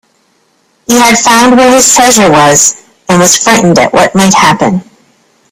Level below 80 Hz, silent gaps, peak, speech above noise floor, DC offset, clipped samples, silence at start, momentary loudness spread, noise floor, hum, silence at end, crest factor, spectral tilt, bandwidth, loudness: -40 dBFS; none; 0 dBFS; 47 dB; under 0.1%; 1%; 0.9 s; 8 LU; -52 dBFS; none; 0.7 s; 6 dB; -3 dB/octave; over 20 kHz; -5 LUFS